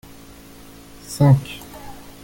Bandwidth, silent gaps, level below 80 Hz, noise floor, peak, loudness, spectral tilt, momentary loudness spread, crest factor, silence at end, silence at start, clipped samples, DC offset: 17 kHz; none; -48 dBFS; -42 dBFS; -2 dBFS; -17 LUFS; -7 dB/octave; 24 LU; 20 dB; 0.3 s; 1.1 s; under 0.1%; under 0.1%